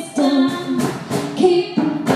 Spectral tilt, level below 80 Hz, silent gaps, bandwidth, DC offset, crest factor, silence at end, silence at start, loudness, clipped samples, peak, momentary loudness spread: -5.5 dB/octave; -62 dBFS; none; 15 kHz; under 0.1%; 16 dB; 0 s; 0 s; -18 LUFS; under 0.1%; -2 dBFS; 7 LU